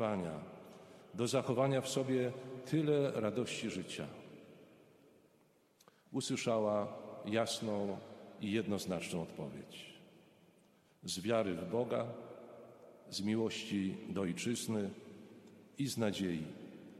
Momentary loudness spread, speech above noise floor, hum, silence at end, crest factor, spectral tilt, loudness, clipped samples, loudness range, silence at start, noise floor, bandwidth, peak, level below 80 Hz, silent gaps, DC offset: 21 LU; 33 dB; none; 0 s; 20 dB; -5 dB/octave; -38 LUFS; under 0.1%; 6 LU; 0 s; -70 dBFS; 15 kHz; -20 dBFS; -76 dBFS; none; under 0.1%